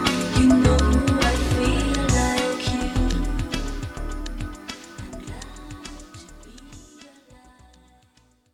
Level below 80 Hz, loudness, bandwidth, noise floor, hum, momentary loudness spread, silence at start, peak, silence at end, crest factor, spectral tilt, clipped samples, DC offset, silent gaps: -28 dBFS; -22 LUFS; 15.5 kHz; -60 dBFS; none; 21 LU; 0 s; -4 dBFS; 1.5 s; 18 dB; -5 dB/octave; under 0.1%; under 0.1%; none